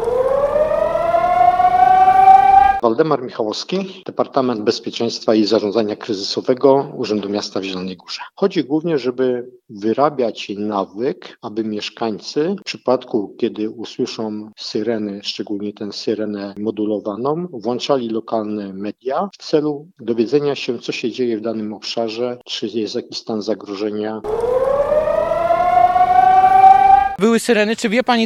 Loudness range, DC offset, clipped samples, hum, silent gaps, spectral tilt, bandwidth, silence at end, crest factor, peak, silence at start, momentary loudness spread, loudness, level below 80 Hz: 10 LU; under 0.1%; under 0.1%; none; none; -5 dB/octave; 12.5 kHz; 0 s; 16 dB; 0 dBFS; 0 s; 14 LU; -17 LUFS; -48 dBFS